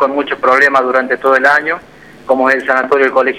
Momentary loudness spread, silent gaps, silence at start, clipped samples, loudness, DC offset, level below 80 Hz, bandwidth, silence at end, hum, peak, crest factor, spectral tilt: 6 LU; none; 0 s; under 0.1%; -11 LUFS; 0.2%; -56 dBFS; 13.5 kHz; 0 s; none; 0 dBFS; 12 dB; -4 dB/octave